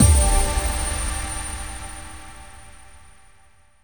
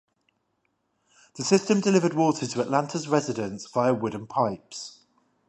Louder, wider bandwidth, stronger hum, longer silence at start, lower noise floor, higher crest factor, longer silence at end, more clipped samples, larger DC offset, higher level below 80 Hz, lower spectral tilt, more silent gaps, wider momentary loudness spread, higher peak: about the same, -23 LUFS vs -25 LUFS; first, 19 kHz vs 11.5 kHz; neither; second, 0 s vs 1.35 s; second, -56 dBFS vs -74 dBFS; about the same, 20 dB vs 22 dB; first, 1.15 s vs 0.6 s; neither; first, 0.5% vs under 0.1%; first, -26 dBFS vs -68 dBFS; second, -3.5 dB/octave vs -5 dB/octave; neither; first, 24 LU vs 12 LU; about the same, -2 dBFS vs -4 dBFS